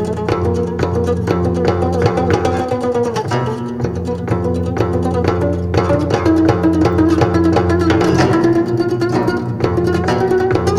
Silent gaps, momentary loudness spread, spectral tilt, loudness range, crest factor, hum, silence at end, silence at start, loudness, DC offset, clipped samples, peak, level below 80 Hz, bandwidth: none; 5 LU; -7.5 dB/octave; 4 LU; 14 dB; none; 0 s; 0 s; -15 LUFS; under 0.1%; under 0.1%; 0 dBFS; -34 dBFS; 12.5 kHz